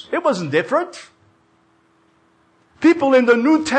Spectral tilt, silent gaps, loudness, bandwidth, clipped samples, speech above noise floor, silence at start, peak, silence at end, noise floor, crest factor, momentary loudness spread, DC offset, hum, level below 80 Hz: -5.5 dB/octave; none; -16 LUFS; 9.2 kHz; under 0.1%; 42 dB; 0.1 s; -4 dBFS; 0 s; -58 dBFS; 14 dB; 10 LU; under 0.1%; none; -62 dBFS